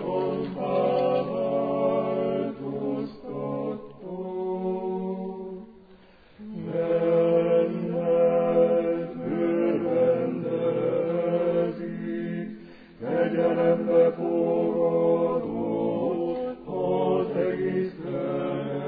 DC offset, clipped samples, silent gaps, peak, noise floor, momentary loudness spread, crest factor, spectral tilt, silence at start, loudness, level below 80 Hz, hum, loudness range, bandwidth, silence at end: under 0.1%; under 0.1%; none; -10 dBFS; -53 dBFS; 12 LU; 14 dB; -11 dB/octave; 0 s; -26 LUFS; -62 dBFS; none; 8 LU; 4.9 kHz; 0 s